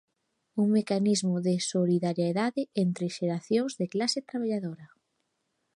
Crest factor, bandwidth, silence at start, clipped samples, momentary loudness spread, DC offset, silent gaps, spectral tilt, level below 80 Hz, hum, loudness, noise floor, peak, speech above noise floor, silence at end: 14 dB; 11.5 kHz; 0.55 s; under 0.1%; 6 LU; under 0.1%; none; -5.5 dB/octave; -78 dBFS; none; -28 LUFS; -78 dBFS; -14 dBFS; 51 dB; 0.9 s